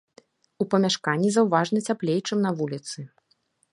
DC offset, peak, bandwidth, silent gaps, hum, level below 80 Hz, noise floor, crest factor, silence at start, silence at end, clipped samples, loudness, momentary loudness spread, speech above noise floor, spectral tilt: under 0.1%; -6 dBFS; 11.5 kHz; none; none; -74 dBFS; -68 dBFS; 20 dB; 0.6 s; 0.65 s; under 0.1%; -24 LUFS; 14 LU; 45 dB; -5 dB/octave